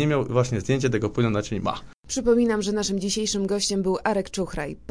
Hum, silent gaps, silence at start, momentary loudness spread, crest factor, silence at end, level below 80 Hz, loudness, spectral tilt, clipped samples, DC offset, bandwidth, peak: none; 1.94-2.03 s; 0 s; 9 LU; 16 dB; 0 s; -46 dBFS; -24 LUFS; -5 dB/octave; under 0.1%; 0.4%; 10.5 kHz; -8 dBFS